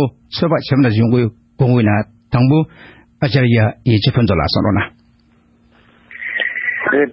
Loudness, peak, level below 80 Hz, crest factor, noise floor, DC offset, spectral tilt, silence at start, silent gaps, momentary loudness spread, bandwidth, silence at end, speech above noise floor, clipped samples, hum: -15 LUFS; -2 dBFS; -38 dBFS; 14 dB; -53 dBFS; under 0.1%; -11 dB/octave; 0 s; none; 8 LU; 5.8 kHz; 0 s; 39 dB; under 0.1%; none